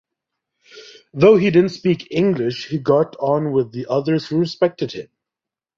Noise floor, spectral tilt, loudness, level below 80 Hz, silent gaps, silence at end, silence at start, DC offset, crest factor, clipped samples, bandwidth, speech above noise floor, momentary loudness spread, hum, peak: -87 dBFS; -7.5 dB/octave; -18 LUFS; -58 dBFS; none; 0.75 s; 0.75 s; under 0.1%; 18 dB; under 0.1%; 7.4 kHz; 70 dB; 10 LU; none; -2 dBFS